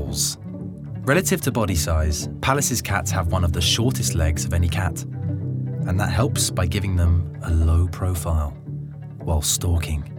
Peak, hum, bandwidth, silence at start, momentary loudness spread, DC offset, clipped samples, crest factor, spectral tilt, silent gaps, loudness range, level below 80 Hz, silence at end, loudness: -2 dBFS; none; 18.5 kHz; 0 s; 10 LU; under 0.1%; under 0.1%; 20 dB; -4.5 dB/octave; none; 2 LU; -34 dBFS; 0 s; -22 LUFS